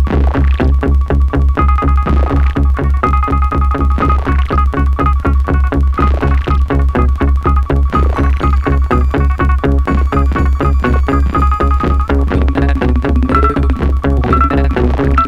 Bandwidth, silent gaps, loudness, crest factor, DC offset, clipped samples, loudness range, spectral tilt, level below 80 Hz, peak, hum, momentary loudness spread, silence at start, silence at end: 5 kHz; none; -13 LUFS; 10 dB; under 0.1%; under 0.1%; 0 LU; -9 dB/octave; -12 dBFS; 0 dBFS; none; 2 LU; 0 s; 0 s